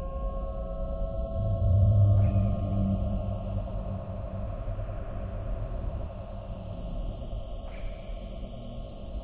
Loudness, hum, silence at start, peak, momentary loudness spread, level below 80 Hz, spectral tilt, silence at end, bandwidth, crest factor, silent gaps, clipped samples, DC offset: -31 LUFS; none; 0 s; -12 dBFS; 17 LU; -34 dBFS; -12.5 dB/octave; 0 s; 4 kHz; 18 dB; none; under 0.1%; under 0.1%